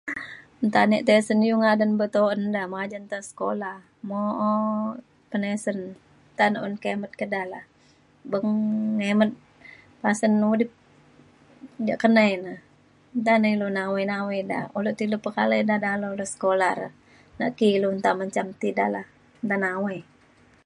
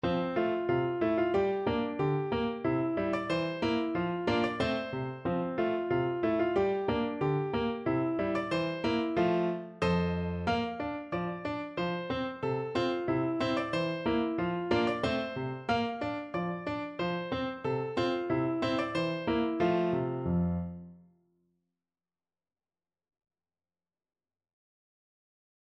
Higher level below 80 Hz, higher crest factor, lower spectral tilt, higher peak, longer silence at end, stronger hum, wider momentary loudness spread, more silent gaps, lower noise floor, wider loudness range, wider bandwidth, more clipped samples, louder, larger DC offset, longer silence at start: second, -70 dBFS vs -56 dBFS; about the same, 20 dB vs 16 dB; second, -6 dB/octave vs -7.5 dB/octave; first, -4 dBFS vs -16 dBFS; second, 0.65 s vs 4.8 s; neither; first, 14 LU vs 6 LU; neither; second, -58 dBFS vs under -90 dBFS; about the same, 5 LU vs 3 LU; first, 11 kHz vs 9.6 kHz; neither; first, -24 LUFS vs -31 LUFS; neither; about the same, 0.05 s vs 0.05 s